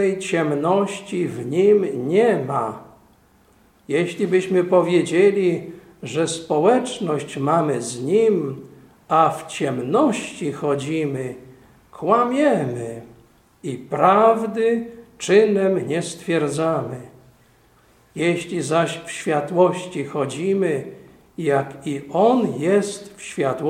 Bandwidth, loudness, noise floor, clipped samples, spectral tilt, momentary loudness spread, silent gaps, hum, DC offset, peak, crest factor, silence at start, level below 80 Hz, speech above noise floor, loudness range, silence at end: 14.5 kHz; -20 LUFS; -55 dBFS; under 0.1%; -5.5 dB/octave; 14 LU; none; none; under 0.1%; -2 dBFS; 18 dB; 0 s; -62 dBFS; 36 dB; 4 LU; 0 s